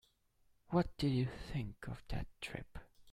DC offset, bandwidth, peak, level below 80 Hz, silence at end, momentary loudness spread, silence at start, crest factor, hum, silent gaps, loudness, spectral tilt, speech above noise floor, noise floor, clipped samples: under 0.1%; 14 kHz; -20 dBFS; -54 dBFS; 0 s; 13 LU; 0.7 s; 22 dB; none; none; -40 LUFS; -7 dB/octave; 34 dB; -74 dBFS; under 0.1%